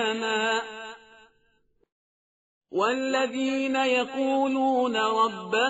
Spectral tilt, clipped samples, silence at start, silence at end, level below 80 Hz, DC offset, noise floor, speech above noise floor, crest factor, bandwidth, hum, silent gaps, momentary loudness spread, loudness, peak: -1 dB/octave; under 0.1%; 0 s; 0 s; -74 dBFS; under 0.1%; -68 dBFS; 43 dB; 16 dB; 8 kHz; none; 1.92-2.61 s; 7 LU; -25 LUFS; -10 dBFS